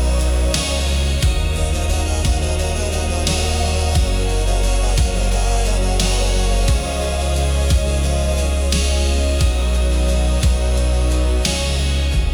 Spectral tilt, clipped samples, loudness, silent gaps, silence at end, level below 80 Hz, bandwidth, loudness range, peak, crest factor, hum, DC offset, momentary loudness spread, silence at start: -4.5 dB/octave; under 0.1%; -18 LUFS; none; 0 s; -18 dBFS; 18 kHz; 1 LU; -4 dBFS; 12 dB; none; under 0.1%; 2 LU; 0 s